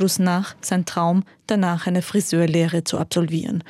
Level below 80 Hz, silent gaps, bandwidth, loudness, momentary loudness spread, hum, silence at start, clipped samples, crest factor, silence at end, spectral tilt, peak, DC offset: -64 dBFS; none; 15 kHz; -21 LUFS; 5 LU; none; 0 s; under 0.1%; 14 dB; 0 s; -5.5 dB/octave; -6 dBFS; under 0.1%